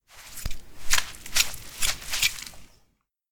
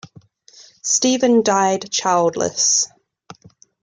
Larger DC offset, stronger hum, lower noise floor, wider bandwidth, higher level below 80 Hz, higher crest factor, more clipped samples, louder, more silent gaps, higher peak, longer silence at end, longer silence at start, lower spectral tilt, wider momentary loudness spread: neither; neither; first, -69 dBFS vs -48 dBFS; first, over 20 kHz vs 11 kHz; first, -38 dBFS vs -64 dBFS; first, 24 dB vs 16 dB; neither; second, -26 LUFS vs -17 LUFS; neither; about the same, -4 dBFS vs -4 dBFS; second, 0.65 s vs 1 s; second, 0.15 s vs 0.85 s; second, 0.5 dB/octave vs -2.5 dB/octave; first, 17 LU vs 5 LU